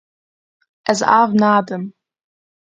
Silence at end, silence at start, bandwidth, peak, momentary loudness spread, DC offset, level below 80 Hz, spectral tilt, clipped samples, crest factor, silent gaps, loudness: 0.85 s; 0.85 s; 9.2 kHz; 0 dBFS; 14 LU; under 0.1%; -64 dBFS; -5 dB/octave; under 0.1%; 18 dB; none; -16 LUFS